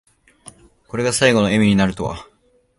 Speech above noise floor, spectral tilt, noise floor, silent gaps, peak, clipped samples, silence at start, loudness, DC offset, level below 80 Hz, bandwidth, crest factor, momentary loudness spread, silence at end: 30 dB; -5 dB/octave; -46 dBFS; none; 0 dBFS; under 0.1%; 0.95 s; -17 LUFS; under 0.1%; -44 dBFS; 11.5 kHz; 18 dB; 14 LU; 0.55 s